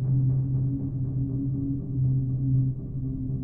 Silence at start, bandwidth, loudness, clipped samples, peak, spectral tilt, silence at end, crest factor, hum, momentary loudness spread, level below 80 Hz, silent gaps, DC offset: 0 s; 1.2 kHz; -27 LUFS; under 0.1%; -16 dBFS; -15.5 dB/octave; 0 s; 10 dB; none; 6 LU; -42 dBFS; none; under 0.1%